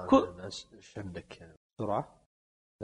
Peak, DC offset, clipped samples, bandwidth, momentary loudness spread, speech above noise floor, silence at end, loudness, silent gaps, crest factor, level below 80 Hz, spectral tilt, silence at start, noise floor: -10 dBFS; under 0.1%; under 0.1%; 9.6 kHz; 25 LU; over 51 dB; 0 s; -34 LUFS; 1.57-1.77 s, 2.26-2.79 s; 24 dB; -60 dBFS; -6 dB/octave; 0 s; under -90 dBFS